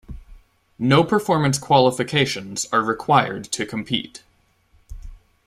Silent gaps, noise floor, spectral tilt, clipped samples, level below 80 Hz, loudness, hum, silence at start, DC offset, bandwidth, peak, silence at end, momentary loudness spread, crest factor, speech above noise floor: none; -60 dBFS; -4.5 dB/octave; under 0.1%; -46 dBFS; -20 LUFS; none; 0.1 s; under 0.1%; 15.5 kHz; -2 dBFS; 0.3 s; 9 LU; 20 dB; 40 dB